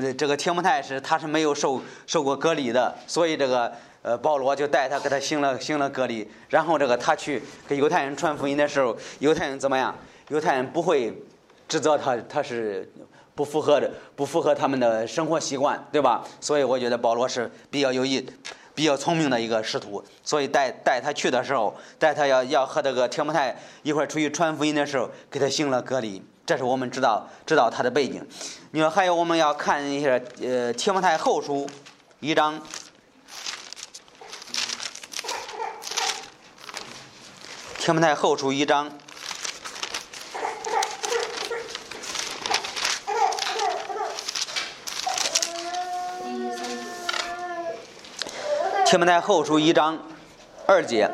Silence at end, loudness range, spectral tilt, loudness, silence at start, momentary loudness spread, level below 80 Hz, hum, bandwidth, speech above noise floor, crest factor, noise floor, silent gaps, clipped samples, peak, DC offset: 0 s; 6 LU; -3.5 dB/octave; -24 LUFS; 0 s; 13 LU; -68 dBFS; none; 15 kHz; 26 dB; 24 dB; -49 dBFS; none; under 0.1%; -2 dBFS; under 0.1%